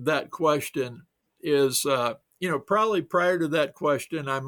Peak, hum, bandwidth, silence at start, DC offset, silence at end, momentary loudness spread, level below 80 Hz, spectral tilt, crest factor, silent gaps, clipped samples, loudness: -10 dBFS; none; over 20 kHz; 0 s; under 0.1%; 0 s; 8 LU; -70 dBFS; -4 dB/octave; 16 dB; none; under 0.1%; -25 LUFS